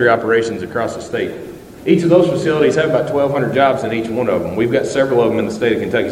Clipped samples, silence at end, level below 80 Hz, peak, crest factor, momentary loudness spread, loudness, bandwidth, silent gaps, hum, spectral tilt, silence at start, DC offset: under 0.1%; 0 s; -48 dBFS; 0 dBFS; 16 dB; 9 LU; -16 LUFS; 15.5 kHz; none; none; -6 dB/octave; 0 s; under 0.1%